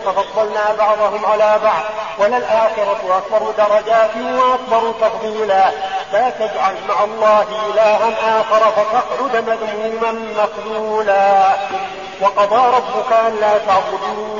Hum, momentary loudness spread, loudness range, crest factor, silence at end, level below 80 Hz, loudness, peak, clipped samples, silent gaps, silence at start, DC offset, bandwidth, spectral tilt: none; 7 LU; 2 LU; 12 dB; 0 s; -56 dBFS; -15 LUFS; -4 dBFS; under 0.1%; none; 0 s; 0.3%; 7.4 kHz; -1 dB/octave